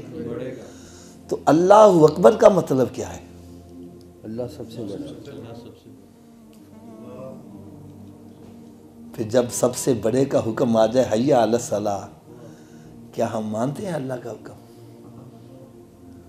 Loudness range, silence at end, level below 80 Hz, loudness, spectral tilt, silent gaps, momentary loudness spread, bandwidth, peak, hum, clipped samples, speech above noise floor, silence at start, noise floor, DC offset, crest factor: 22 LU; 0.1 s; -58 dBFS; -19 LUFS; -6 dB/octave; none; 28 LU; 15.5 kHz; 0 dBFS; none; under 0.1%; 28 dB; 0 s; -47 dBFS; under 0.1%; 22 dB